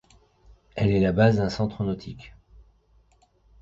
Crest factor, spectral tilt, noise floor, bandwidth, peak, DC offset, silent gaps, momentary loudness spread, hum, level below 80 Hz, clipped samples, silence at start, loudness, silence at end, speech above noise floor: 20 dB; -8 dB/octave; -61 dBFS; 7.6 kHz; -6 dBFS; under 0.1%; none; 20 LU; none; -46 dBFS; under 0.1%; 0.75 s; -24 LUFS; 1.3 s; 39 dB